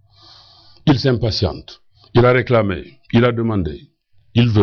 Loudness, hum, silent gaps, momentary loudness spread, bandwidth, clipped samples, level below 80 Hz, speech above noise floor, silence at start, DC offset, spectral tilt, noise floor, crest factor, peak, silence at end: -17 LUFS; none; none; 13 LU; 6.6 kHz; under 0.1%; -38 dBFS; 32 dB; 0.85 s; under 0.1%; -8 dB/octave; -47 dBFS; 14 dB; -4 dBFS; 0 s